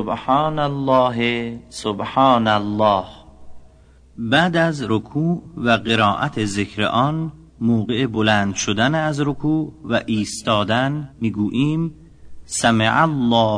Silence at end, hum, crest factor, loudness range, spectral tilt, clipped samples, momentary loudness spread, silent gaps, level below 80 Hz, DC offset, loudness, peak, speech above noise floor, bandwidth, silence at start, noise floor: 0 s; none; 16 dB; 2 LU; -5 dB/octave; under 0.1%; 9 LU; none; -48 dBFS; under 0.1%; -19 LUFS; -2 dBFS; 30 dB; 10.5 kHz; 0 s; -48 dBFS